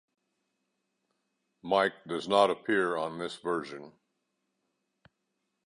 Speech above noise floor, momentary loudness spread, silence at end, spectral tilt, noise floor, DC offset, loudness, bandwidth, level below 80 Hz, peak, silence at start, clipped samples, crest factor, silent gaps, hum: 52 dB; 16 LU; 1.8 s; -4.5 dB/octave; -82 dBFS; under 0.1%; -29 LUFS; 11 kHz; -74 dBFS; -10 dBFS; 1.65 s; under 0.1%; 24 dB; none; none